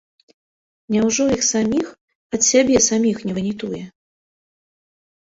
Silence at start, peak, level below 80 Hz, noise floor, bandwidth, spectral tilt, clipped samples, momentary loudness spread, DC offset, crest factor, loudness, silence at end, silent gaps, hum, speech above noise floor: 0.9 s; -2 dBFS; -52 dBFS; under -90 dBFS; 8 kHz; -3.5 dB/octave; under 0.1%; 14 LU; under 0.1%; 18 dB; -18 LUFS; 1.3 s; 2.01-2.08 s, 2.15-2.30 s; none; over 72 dB